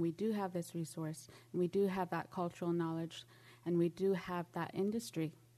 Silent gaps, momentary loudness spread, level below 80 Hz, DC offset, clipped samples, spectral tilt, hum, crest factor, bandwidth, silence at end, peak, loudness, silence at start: none; 10 LU; -76 dBFS; under 0.1%; under 0.1%; -6.5 dB/octave; none; 14 dB; 13.5 kHz; 0.25 s; -24 dBFS; -39 LUFS; 0 s